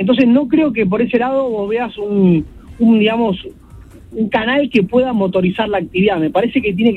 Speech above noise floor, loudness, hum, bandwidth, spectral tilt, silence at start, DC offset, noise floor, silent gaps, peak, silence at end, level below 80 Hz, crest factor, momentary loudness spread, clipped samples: 24 dB; -15 LUFS; none; 5.4 kHz; -8.5 dB/octave; 0 s; under 0.1%; -38 dBFS; none; 0 dBFS; 0 s; -42 dBFS; 14 dB; 8 LU; under 0.1%